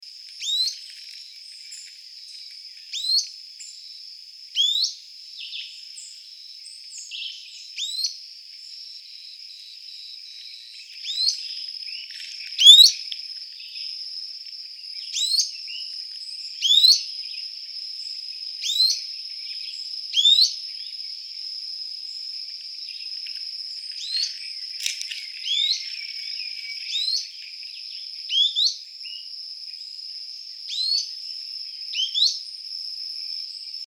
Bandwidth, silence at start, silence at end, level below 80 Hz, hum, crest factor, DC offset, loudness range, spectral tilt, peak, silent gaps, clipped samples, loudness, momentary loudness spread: over 20 kHz; 0 s; 0 s; under -90 dBFS; none; 26 dB; under 0.1%; 16 LU; 12 dB/octave; 0 dBFS; none; under 0.1%; -21 LUFS; 20 LU